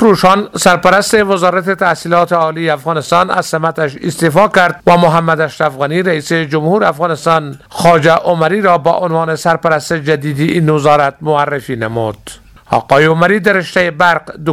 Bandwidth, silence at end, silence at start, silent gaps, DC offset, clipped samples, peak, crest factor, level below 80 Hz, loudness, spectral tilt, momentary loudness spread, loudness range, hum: 15.5 kHz; 0 s; 0 s; none; under 0.1%; 0.4%; 0 dBFS; 12 dB; -46 dBFS; -11 LUFS; -5.5 dB/octave; 7 LU; 2 LU; none